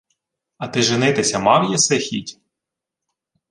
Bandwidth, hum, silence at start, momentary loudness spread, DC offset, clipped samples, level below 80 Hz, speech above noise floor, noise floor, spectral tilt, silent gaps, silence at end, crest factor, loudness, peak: 11.5 kHz; none; 0.6 s; 13 LU; under 0.1%; under 0.1%; -58 dBFS; 66 dB; -84 dBFS; -3 dB/octave; none; 1.2 s; 20 dB; -17 LUFS; 0 dBFS